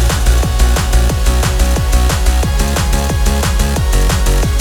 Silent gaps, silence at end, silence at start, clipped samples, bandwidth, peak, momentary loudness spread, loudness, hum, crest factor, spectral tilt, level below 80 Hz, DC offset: none; 0 s; 0 s; under 0.1%; 18.5 kHz; 0 dBFS; 2 LU; -14 LUFS; none; 10 dB; -4.5 dB/octave; -12 dBFS; under 0.1%